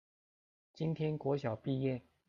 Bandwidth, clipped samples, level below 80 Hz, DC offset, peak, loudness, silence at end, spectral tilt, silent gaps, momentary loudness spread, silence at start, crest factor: 7.2 kHz; under 0.1%; -72 dBFS; under 0.1%; -22 dBFS; -37 LUFS; 0.3 s; -9 dB/octave; none; 3 LU; 0.75 s; 16 dB